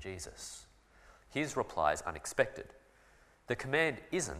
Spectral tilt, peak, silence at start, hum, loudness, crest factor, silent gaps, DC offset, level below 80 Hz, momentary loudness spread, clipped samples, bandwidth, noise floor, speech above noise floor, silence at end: -3.5 dB/octave; -12 dBFS; 0 s; none; -35 LUFS; 26 dB; none; under 0.1%; -60 dBFS; 15 LU; under 0.1%; 15.5 kHz; -64 dBFS; 29 dB; 0 s